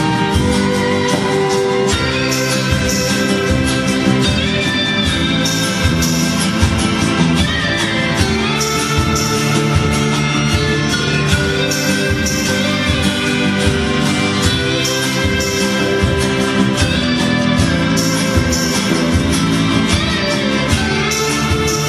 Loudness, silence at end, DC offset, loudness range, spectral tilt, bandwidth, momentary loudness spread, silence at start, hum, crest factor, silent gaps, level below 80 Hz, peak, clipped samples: -14 LUFS; 0 s; under 0.1%; 0 LU; -4 dB/octave; 13 kHz; 1 LU; 0 s; none; 14 dB; none; -28 dBFS; 0 dBFS; under 0.1%